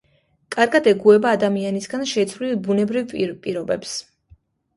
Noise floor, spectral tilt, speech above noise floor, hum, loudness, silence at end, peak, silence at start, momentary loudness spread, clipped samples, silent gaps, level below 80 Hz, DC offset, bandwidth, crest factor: -54 dBFS; -5 dB/octave; 35 dB; none; -20 LUFS; 0.75 s; -2 dBFS; 0.5 s; 12 LU; under 0.1%; none; -60 dBFS; under 0.1%; 11.5 kHz; 18 dB